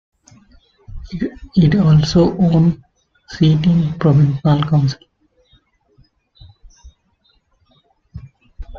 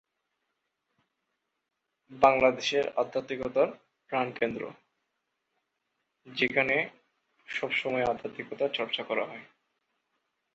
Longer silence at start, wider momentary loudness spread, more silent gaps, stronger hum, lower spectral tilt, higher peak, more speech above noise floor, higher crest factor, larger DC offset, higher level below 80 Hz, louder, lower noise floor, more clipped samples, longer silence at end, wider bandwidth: second, 0.9 s vs 2.1 s; first, 23 LU vs 14 LU; neither; neither; first, -8 dB/octave vs -4 dB/octave; first, -2 dBFS vs -8 dBFS; second, 47 dB vs 54 dB; second, 16 dB vs 24 dB; neither; first, -40 dBFS vs -66 dBFS; first, -15 LUFS vs -29 LUFS; second, -60 dBFS vs -83 dBFS; neither; second, 0 s vs 1.1 s; second, 7 kHz vs 8 kHz